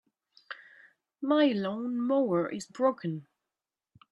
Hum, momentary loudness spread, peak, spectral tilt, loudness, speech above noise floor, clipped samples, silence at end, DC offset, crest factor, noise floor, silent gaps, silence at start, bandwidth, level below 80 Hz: none; 20 LU; -12 dBFS; -6.5 dB/octave; -29 LUFS; over 62 dB; under 0.1%; 0.9 s; under 0.1%; 18 dB; under -90 dBFS; none; 0.5 s; 11 kHz; -80 dBFS